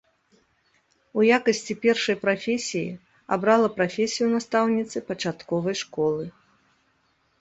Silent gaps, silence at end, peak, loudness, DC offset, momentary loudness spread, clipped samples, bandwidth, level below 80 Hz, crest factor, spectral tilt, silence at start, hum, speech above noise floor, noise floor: none; 1.1 s; -4 dBFS; -24 LUFS; under 0.1%; 11 LU; under 0.1%; 8.2 kHz; -66 dBFS; 20 dB; -4.5 dB/octave; 1.15 s; none; 44 dB; -67 dBFS